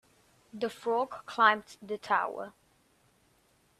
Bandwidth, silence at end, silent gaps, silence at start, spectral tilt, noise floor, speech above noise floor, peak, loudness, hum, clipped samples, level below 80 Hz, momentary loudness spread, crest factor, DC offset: 14 kHz; 1.3 s; none; 0.55 s; -3.5 dB/octave; -68 dBFS; 38 dB; -8 dBFS; -30 LUFS; none; under 0.1%; -76 dBFS; 17 LU; 24 dB; under 0.1%